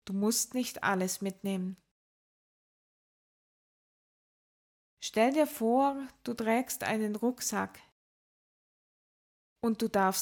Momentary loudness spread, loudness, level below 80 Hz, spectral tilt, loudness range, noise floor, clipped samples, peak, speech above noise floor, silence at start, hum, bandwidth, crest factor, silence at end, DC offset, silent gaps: 9 LU; -31 LUFS; -72 dBFS; -4 dB/octave; 11 LU; under -90 dBFS; under 0.1%; -14 dBFS; over 59 dB; 0.05 s; none; 18 kHz; 20 dB; 0 s; under 0.1%; 1.91-4.97 s, 7.92-9.56 s